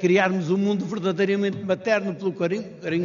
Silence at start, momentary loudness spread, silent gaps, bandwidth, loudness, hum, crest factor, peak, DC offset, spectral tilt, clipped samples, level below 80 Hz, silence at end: 0 s; 6 LU; none; 7.2 kHz; -24 LUFS; none; 18 dB; -6 dBFS; under 0.1%; -5.5 dB/octave; under 0.1%; -68 dBFS; 0 s